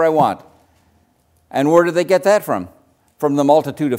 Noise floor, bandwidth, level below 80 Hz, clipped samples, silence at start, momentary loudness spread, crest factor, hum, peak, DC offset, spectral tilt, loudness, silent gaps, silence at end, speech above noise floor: -59 dBFS; 16 kHz; -62 dBFS; under 0.1%; 0 s; 11 LU; 16 dB; none; 0 dBFS; under 0.1%; -6 dB/octave; -16 LUFS; none; 0 s; 44 dB